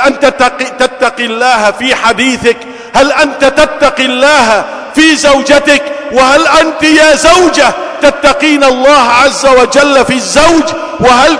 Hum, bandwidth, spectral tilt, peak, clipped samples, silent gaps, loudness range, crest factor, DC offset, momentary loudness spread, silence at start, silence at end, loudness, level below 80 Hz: none; 11 kHz; -2.5 dB/octave; 0 dBFS; 3%; none; 3 LU; 6 dB; under 0.1%; 6 LU; 0 s; 0 s; -7 LUFS; -34 dBFS